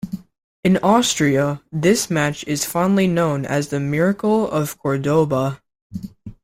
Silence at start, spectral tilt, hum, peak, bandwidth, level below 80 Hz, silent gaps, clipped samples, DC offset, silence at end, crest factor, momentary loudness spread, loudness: 0.05 s; -5 dB/octave; none; -4 dBFS; 16.5 kHz; -52 dBFS; 0.44-0.63 s, 5.82-5.90 s; under 0.1%; under 0.1%; 0.1 s; 16 dB; 18 LU; -19 LUFS